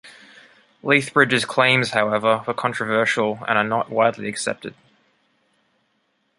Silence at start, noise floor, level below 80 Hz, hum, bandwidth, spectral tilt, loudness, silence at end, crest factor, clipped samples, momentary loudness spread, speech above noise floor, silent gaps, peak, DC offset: 0.05 s; -68 dBFS; -64 dBFS; none; 11.5 kHz; -4 dB/octave; -19 LUFS; 1.7 s; 20 dB; under 0.1%; 10 LU; 48 dB; none; -2 dBFS; under 0.1%